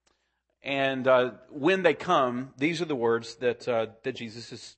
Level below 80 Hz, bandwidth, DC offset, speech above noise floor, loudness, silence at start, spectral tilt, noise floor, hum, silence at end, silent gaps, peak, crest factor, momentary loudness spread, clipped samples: -72 dBFS; 8.8 kHz; under 0.1%; 49 dB; -27 LUFS; 0.65 s; -5.5 dB/octave; -76 dBFS; none; 0.1 s; none; -8 dBFS; 20 dB; 12 LU; under 0.1%